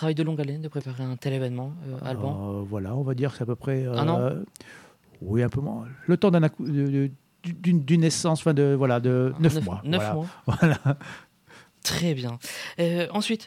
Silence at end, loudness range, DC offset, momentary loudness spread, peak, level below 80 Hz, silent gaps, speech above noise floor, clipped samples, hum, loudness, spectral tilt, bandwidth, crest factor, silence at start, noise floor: 0 s; 6 LU; under 0.1%; 12 LU; -8 dBFS; -58 dBFS; none; 29 dB; under 0.1%; none; -26 LUFS; -6.5 dB/octave; 15.5 kHz; 16 dB; 0 s; -53 dBFS